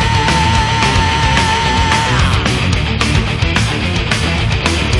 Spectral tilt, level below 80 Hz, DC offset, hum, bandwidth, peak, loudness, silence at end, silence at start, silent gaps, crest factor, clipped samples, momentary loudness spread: -4.5 dB/octave; -22 dBFS; under 0.1%; none; 11.5 kHz; 0 dBFS; -13 LUFS; 0 s; 0 s; none; 12 dB; under 0.1%; 3 LU